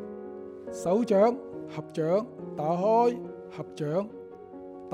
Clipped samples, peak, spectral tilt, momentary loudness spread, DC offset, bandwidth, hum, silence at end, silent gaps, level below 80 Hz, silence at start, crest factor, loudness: under 0.1%; -10 dBFS; -7.5 dB/octave; 19 LU; under 0.1%; 12.5 kHz; none; 0 s; none; -70 dBFS; 0 s; 18 dB; -28 LUFS